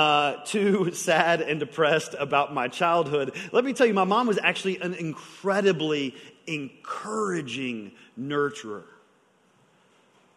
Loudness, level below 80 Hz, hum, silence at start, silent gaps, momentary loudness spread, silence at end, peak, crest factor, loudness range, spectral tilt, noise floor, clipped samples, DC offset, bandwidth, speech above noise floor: -25 LUFS; -74 dBFS; none; 0 s; none; 13 LU; 1.5 s; -4 dBFS; 22 dB; 8 LU; -4.5 dB/octave; -63 dBFS; under 0.1%; under 0.1%; 12 kHz; 37 dB